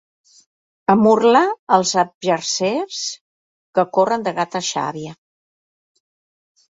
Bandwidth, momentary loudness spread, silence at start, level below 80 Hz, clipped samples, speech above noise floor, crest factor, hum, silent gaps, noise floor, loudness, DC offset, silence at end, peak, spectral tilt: 8 kHz; 13 LU; 0.9 s; -66 dBFS; under 0.1%; over 73 dB; 18 dB; none; 1.59-1.67 s, 2.15-2.21 s, 3.21-3.73 s; under -90 dBFS; -18 LUFS; under 0.1%; 1.6 s; -2 dBFS; -4 dB/octave